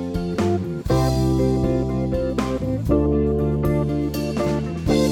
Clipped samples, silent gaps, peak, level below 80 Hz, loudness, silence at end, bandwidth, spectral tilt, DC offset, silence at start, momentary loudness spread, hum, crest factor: under 0.1%; none; -6 dBFS; -30 dBFS; -21 LUFS; 0 s; 17 kHz; -7.5 dB/octave; under 0.1%; 0 s; 5 LU; none; 14 dB